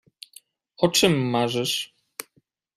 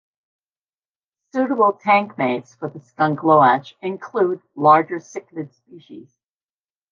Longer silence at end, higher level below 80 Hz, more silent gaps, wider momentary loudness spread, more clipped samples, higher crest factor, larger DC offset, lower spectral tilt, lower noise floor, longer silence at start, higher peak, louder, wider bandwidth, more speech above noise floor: second, 0.55 s vs 0.9 s; first, -60 dBFS vs -76 dBFS; neither; first, 25 LU vs 18 LU; neither; about the same, 22 dB vs 20 dB; neither; second, -4 dB/octave vs -7 dB/octave; second, -67 dBFS vs under -90 dBFS; second, 0.8 s vs 1.35 s; about the same, -4 dBFS vs -2 dBFS; second, -22 LUFS vs -18 LUFS; first, 16 kHz vs 7.2 kHz; second, 45 dB vs over 71 dB